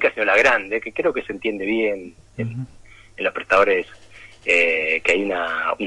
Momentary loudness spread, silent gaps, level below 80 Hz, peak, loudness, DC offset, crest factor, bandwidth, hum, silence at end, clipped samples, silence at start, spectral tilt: 15 LU; none; -52 dBFS; -4 dBFS; -20 LUFS; under 0.1%; 16 dB; 11 kHz; none; 0 s; under 0.1%; 0 s; -4.5 dB/octave